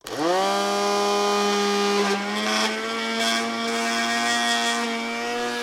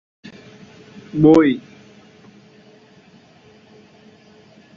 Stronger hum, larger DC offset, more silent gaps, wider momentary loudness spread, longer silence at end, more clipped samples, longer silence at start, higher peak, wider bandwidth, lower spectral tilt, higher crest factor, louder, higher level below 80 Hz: neither; neither; neither; second, 5 LU vs 29 LU; second, 0 s vs 3.2 s; neither; second, 0.05 s vs 1.15 s; second, -8 dBFS vs -2 dBFS; first, 16 kHz vs 7.2 kHz; second, -2.5 dB/octave vs -8 dB/octave; about the same, 16 dB vs 20 dB; second, -22 LUFS vs -15 LUFS; second, -68 dBFS vs -54 dBFS